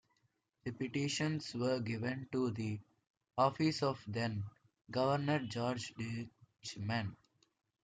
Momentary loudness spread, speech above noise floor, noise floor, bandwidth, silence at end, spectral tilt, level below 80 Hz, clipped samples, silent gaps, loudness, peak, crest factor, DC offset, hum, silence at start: 13 LU; 43 dB; -80 dBFS; 9.4 kHz; 0.7 s; -5.5 dB/octave; -74 dBFS; under 0.1%; 3.10-3.21 s, 4.81-4.85 s; -38 LUFS; -18 dBFS; 20 dB; under 0.1%; none; 0.65 s